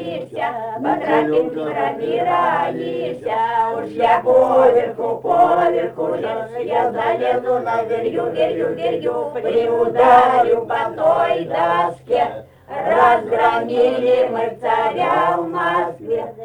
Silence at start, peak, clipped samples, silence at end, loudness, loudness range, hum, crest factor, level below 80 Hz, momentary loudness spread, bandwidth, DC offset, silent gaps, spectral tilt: 0 s; 0 dBFS; under 0.1%; 0 s; -18 LUFS; 3 LU; none; 16 dB; -56 dBFS; 10 LU; 10 kHz; under 0.1%; none; -6.5 dB/octave